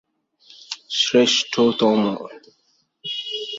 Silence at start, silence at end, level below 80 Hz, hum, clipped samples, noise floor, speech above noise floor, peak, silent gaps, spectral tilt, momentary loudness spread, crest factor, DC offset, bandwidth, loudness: 0.7 s; 0 s; -66 dBFS; none; under 0.1%; -53 dBFS; 34 dB; -4 dBFS; none; -3.5 dB/octave; 18 LU; 18 dB; under 0.1%; 8 kHz; -19 LUFS